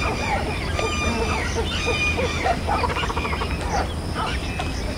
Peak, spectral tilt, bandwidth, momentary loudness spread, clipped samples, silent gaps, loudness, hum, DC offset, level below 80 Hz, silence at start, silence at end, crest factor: -8 dBFS; -4.5 dB/octave; 16 kHz; 5 LU; under 0.1%; none; -23 LUFS; none; under 0.1%; -30 dBFS; 0 s; 0 s; 16 dB